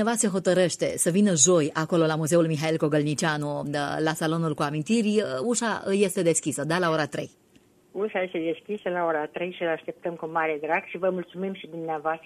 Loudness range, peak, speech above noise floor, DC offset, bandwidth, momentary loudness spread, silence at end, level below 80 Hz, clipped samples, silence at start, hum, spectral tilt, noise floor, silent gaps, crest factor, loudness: 7 LU; -6 dBFS; 34 dB; under 0.1%; 14 kHz; 10 LU; 0.1 s; -68 dBFS; under 0.1%; 0 s; none; -4.5 dB/octave; -59 dBFS; none; 20 dB; -25 LUFS